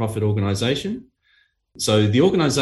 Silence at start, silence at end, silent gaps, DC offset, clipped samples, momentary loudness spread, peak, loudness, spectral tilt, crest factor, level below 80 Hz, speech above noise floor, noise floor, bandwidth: 0 s; 0 s; none; under 0.1%; under 0.1%; 10 LU; -4 dBFS; -20 LUFS; -5.5 dB/octave; 16 dB; -52 dBFS; 43 dB; -62 dBFS; 12.5 kHz